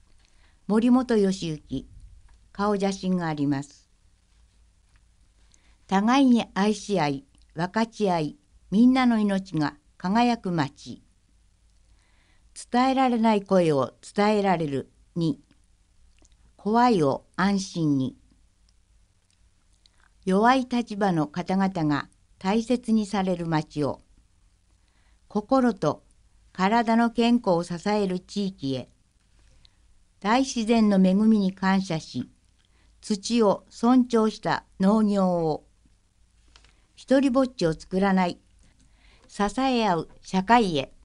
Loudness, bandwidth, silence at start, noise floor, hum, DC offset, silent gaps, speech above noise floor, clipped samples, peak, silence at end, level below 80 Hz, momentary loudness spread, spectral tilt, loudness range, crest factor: -24 LUFS; 11 kHz; 0.7 s; -62 dBFS; none; under 0.1%; none; 39 dB; under 0.1%; -6 dBFS; 0.2 s; -54 dBFS; 13 LU; -6 dB/octave; 5 LU; 20 dB